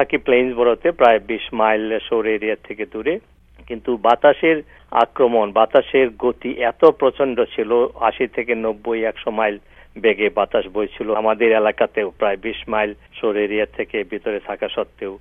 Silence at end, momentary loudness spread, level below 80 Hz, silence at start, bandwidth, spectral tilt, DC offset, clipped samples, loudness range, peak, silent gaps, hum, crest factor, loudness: 0.05 s; 10 LU; -48 dBFS; 0 s; 4.1 kHz; -7 dB/octave; under 0.1%; under 0.1%; 4 LU; 0 dBFS; none; none; 18 dB; -19 LUFS